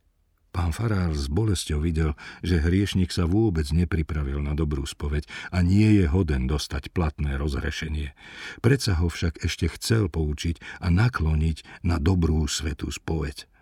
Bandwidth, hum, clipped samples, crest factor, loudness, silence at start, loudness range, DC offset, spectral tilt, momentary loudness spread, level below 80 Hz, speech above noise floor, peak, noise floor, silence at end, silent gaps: 14.5 kHz; none; under 0.1%; 18 dB; -25 LUFS; 0.55 s; 2 LU; under 0.1%; -6 dB/octave; 8 LU; -32 dBFS; 41 dB; -6 dBFS; -65 dBFS; 0.2 s; none